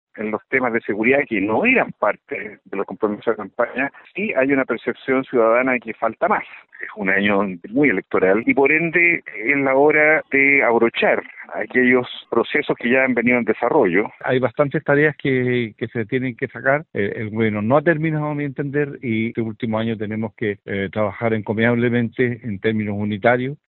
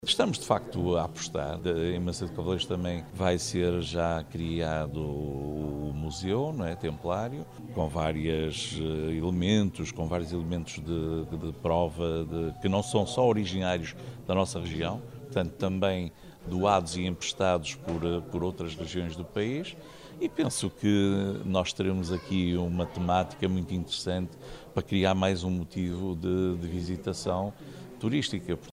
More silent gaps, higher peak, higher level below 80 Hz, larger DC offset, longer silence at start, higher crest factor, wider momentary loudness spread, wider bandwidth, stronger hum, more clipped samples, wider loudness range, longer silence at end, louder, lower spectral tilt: neither; first, -2 dBFS vs -8 dBFS; second, -60 dBFS vs -48 dBFS; neither; first, 0.15 s vs 0 s; about the same, 18 dB vs 22 dB; about the same, 10 LU vs 8 LU; second, 4.2 kHz vs 15.5 kHz; neither; neither; first, 6 LU vs 3 LU; first, 0.15 s vs 0 s; first, -19 LUFS vs -30 LUFS; first, -11 dB/octave vs -5.5 dB/octave